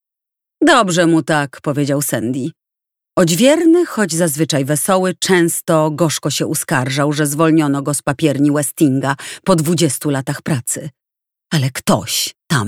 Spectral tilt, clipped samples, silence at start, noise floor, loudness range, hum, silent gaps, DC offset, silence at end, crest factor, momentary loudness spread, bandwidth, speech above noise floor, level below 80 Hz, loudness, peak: -4.5 dB/octave; under 0.1%; 0.6 s; -84 dBFS; 4 LU; none; none; under 0.1%; 0 s; 16 dB; 9 LU; 17.5 kHz; 69 dB; -54 dBFS; -15 LUFS; 0 dBFS